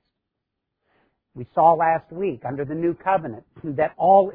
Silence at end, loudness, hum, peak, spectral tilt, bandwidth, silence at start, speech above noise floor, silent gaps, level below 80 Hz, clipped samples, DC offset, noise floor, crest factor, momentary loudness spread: 0 s; -22 LUFS; none; -4 dBFS; -11 dB/octave; 4 kHz; 1.35 s; 60 dB; none; -60 dBFS; under 0.1%; under 0.1%; -81 dBFS; 18 dB; 15 LU